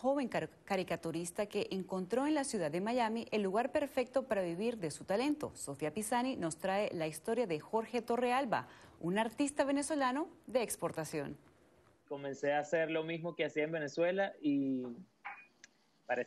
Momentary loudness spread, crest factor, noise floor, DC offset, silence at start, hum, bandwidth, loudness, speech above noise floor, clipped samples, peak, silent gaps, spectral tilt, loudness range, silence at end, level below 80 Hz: 8 LU; 16 dB; -67 dBFS; under 0.1%; 0 s; none; 13 kHz; -36 LUFS; 31 dB; under 0.1%; -20 dBFS; none; -4.5 dB/octave; 2 LU; 0 s; -72 dBFS